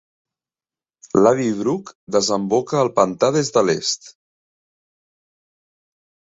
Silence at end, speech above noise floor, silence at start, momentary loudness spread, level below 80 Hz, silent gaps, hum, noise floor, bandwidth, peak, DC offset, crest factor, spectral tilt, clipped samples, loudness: 2.1 s; over 72 dB; 1.15 s; 7 LU; -60 dBFS; 1.95-2.07 s; none; under -90 dBFS; 8 kHz; -2 dBFS; under 0.1%; 20 dB; -4.5 dB/octave; under 0.1%; -19 LUFS